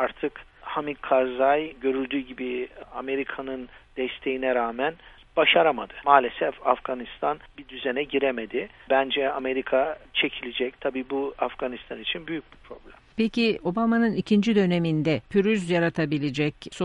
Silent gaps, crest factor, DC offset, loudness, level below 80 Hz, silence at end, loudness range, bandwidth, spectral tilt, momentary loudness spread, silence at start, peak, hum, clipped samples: none; 24 dB; under 0.1%; -25 LUFS; -56 dBFS; 0 s; 6 LU; 11 kHz; -6.5 dB/octave; 12 LU; 0 s; -2 dBFS; none; under 0.1%